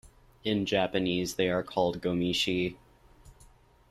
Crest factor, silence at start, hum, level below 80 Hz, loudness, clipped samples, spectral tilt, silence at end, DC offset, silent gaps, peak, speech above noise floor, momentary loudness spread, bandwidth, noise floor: 18 dB; 0.05 s; none; -58 dBFS; -29 LUFS; under 0.1%; -5 dB/octave; 0.45 s; under 0.1%; none; -12 dBFS; 29 dB; 4 LU; 14 kHz; -58 dBFS